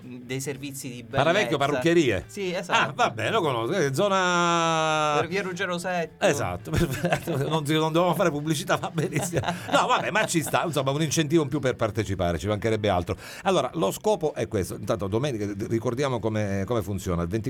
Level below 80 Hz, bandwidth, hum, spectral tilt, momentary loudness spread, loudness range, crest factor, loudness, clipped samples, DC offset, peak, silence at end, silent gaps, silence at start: -50 dBFS; 18.5 kHz; none; -5 dB/octave; 7 LU; 3 LU; 20 dB; -25 LUFS; under 0.1%; under 0.1%; -6 dBFS; 0 s; none; 0 s